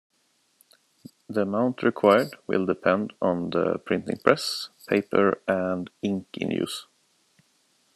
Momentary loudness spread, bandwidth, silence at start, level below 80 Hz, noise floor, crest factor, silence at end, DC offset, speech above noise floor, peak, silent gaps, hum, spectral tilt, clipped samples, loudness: 9 LU; 13 kHz; 1.3 s; -70 dBFS; -67 dBFS; 24 dB; 1.15 s; under 0.1%; 42 dB; -2 dBFS; none; none; -5.5 dB/octave; under 0.1%; -25 LUFS